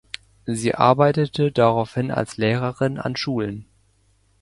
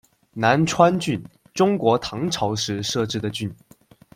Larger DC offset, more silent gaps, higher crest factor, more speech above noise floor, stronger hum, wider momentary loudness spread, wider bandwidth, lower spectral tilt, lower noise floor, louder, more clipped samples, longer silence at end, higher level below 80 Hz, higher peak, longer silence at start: neither; neither; about the same, 20 dB vs 20 dB; first, 41 dB vs 30 dB; neither; about the same, 12 LU vs 12 LU; second, 11.5 kHz vs 16 kHz; first, -6.5 dB/octave vs -5 dB/octave; first, -61 dBFS vs -51 dBFS; about the same, -21 LUFS vs -21 LUFS; neither; first, 0.8 s vs 0.6 s; about the same, -54 dBFS vs -56 dBFS; about the same, 0 dBFS vs -2 dBFS; about the same, 0.45 s vs 0.35 s